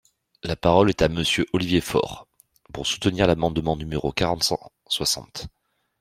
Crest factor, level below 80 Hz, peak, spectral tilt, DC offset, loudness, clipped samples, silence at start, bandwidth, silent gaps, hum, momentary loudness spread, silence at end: 22 dB; -44 dBFS; -2 dBFS; -4.5 dB/octave; under 0.1%; -23 LUFS; under 0.1%; 0.45 s; 16 kHz; none; none; 16 LU; 0.5 s